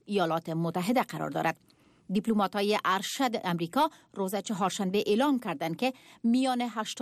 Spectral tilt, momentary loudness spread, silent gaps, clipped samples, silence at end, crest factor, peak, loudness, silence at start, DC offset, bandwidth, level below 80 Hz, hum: -5 dB/octave; 6 LU; none; under 0.1%; 0 s; 14 dB; -16 dBFS; -29 LUFS; 0.1 s; under 0.1%; 15.5 kHz; -72 dBFS; none